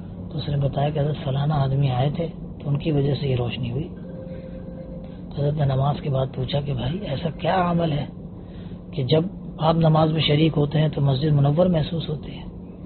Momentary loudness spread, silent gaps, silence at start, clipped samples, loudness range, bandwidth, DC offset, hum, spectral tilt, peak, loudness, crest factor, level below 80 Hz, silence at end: 17 LU; none; 0 s; under 0.1%; 6 LU; 4.5 kHz; under 0.1%; none; -6.5 dB/octave; -4 dBFS; -23 LUFS; 18 dB; -42 dBFS; 0 s